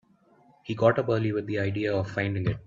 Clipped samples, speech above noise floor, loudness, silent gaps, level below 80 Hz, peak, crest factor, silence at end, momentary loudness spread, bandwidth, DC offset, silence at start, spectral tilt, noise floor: under 0.1%; 34 dB; -27 LUFS; none; -56 dBFS; -8 dBFS; 20 dB; 0.05 s; 7 LU; 7.2 kHz; under 0.1%; 0.65 s; -8 dB/octave; -60 dBFS